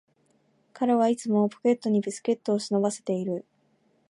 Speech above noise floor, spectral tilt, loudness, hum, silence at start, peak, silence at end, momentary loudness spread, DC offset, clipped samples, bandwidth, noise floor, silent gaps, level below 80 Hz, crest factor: 42 dB; -6 dB/octave; -26 LUFS; none; 0.75 s; -12 dBFS; 0.7 s; 6 LU; under 0.1%; under 0.1%; 11.5 kHz; -67 dBFS; none; -78 dBFS; 16 dB